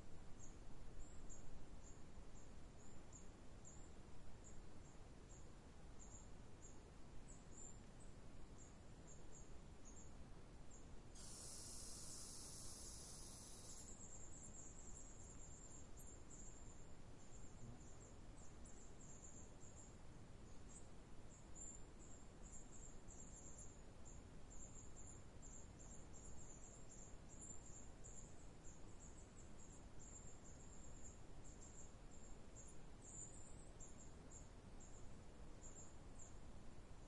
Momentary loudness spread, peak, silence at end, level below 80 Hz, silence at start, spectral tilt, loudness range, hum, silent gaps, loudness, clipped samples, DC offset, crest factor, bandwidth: 7 LU; -40 dBFS; 0 s; -62 dBFS; 0 s; -3.5 dB/octave; 7 LU; none; none; -60 LUFS; under 0.1%; under 0.1%; 16 dB; 12 kHz